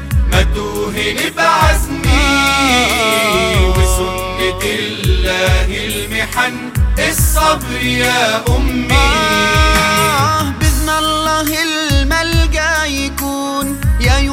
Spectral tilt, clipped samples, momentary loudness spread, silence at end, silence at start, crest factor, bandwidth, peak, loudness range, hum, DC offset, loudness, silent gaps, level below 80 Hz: -4 dB/octave; under 0.1%; 7 LU; 0 s; 0 s; 14 dB; 16.5 kHz; 0 dBFS; 3 LU; none; under 0.1%; -13 LUFS; none; -18 dBFS